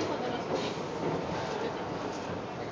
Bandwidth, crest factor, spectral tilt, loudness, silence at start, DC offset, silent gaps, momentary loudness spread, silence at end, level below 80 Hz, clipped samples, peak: 8 kHz; 14 dB; -5.5 dB/octave; -34 LUFS; 0 s; under 0.1%; none; 4 LU; 0 s; -58 dBFS; under 0.1%; -20 dBFS